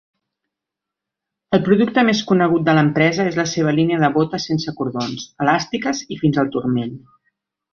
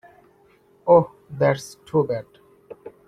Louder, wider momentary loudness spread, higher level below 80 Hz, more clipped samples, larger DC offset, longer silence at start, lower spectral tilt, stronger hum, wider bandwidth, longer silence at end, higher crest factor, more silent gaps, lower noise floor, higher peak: first, -18 LUFS vs -22 LUFS; second, 8 LU vs 17 LU; first, -56 dBFS vs -62 dBFS; neither; neither; first, 1.5 s vs 0.85 s; about the same, -6 dB/octave vs -7 dB/octave; neither; second, 7 kHz vs 12.5 kHz; first, 0.75 s vs 0.2 s; about the same, 18 dB vs 20 dB; neither; first, -84 dBFS vs -57 dBFS; about the same, -2 dBFS vs -4 dBFS